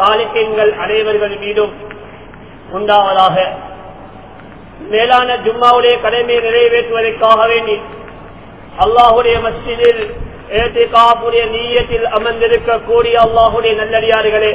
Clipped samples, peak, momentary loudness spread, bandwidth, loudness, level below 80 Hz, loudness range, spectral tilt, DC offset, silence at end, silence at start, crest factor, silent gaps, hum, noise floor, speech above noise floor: 0.5%; 0 dBFS; 15 LU; 4 kHz; -12 LUFS; -36 dBFS; 4 LU; -7.5 dB/octave; 0.6%; 0 s; 0 s; 12 dB; none; none; -34 dBFS; 23 dB